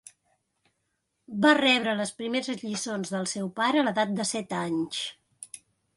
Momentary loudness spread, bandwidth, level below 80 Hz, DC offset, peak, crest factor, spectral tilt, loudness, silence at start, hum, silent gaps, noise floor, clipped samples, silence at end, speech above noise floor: 20 LU; 11.5 kHz; -72 dBFS; under 0.1%; -6 dBFS; 22 dB; -3.5 dB/octave; -26 LUFS; 1.3 s; none; none; -78 dBFS; under 0.1%; 0.4 s; 51 dB